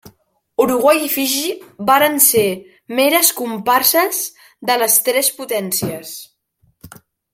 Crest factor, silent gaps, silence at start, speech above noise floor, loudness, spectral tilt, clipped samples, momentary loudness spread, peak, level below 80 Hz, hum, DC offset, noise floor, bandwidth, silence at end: 18 dB; none; 0.05 s; 45 dB; -15 LUFS; -2 dB/octave; under 0.1%; 15 LU; 0 dBFS; -60 dBFS; none; under 0.1%; -61 dBFS; 16.5 kHz; 0.45 s